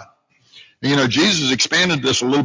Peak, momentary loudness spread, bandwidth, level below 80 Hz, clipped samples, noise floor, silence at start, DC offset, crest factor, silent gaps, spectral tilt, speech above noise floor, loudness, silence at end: -4 dBFS; 4 LU; 7.6 kHz; -52 dBFS; under 0.1%; -54 dBFS; 0 s; under 0.1%; 14 dB; none; -3.5 dB/octave; 38 dB; -16 LUFS; 0 s